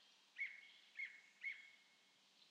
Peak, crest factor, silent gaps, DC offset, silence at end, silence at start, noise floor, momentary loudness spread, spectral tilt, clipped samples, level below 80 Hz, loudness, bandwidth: -38 dBFS; 18 dB; none; under 0.1%; 0 s; 0 s; -74 dBFS; 16 LU; 1 dB/octave; under 0.1%; under -90 dBFS; -52 LUFS; 10 kHz